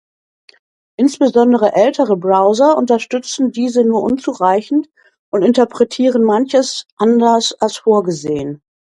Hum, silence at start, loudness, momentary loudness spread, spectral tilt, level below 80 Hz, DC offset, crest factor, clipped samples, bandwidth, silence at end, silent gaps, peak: none; 1 s; -14 LUFS; 9 LU; -5 dB/octave; -58 dBFS; under 0.1%; 14 dB; under 0.1%; 11.5 kHz; 0.35 s; 5.19-5.32 s, 6.92-6.97 s; 0 dBFS